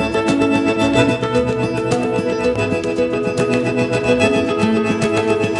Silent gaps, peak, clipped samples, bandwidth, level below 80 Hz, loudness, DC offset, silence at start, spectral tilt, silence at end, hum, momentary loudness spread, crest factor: none; 0 dBFS; under 0.1%; 11.5 kHz; -42 dBFS; -17 LUFS; under 0.1%; 0 s; -6 dB/octave; 0 s; none; 4 LU; 16 dB